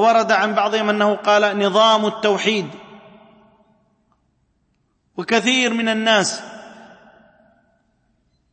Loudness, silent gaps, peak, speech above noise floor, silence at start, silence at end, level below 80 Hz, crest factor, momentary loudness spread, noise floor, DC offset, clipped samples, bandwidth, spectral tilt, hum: -17 LUFS; none; -2 dBFS; 49 dB; 0 s; 1.8 s; -70 dBFS; 18 dB; 17 LU; -66 dBFS; under 0.1%; under 0.1%; 8.8 kHz; -3 dB/octave; none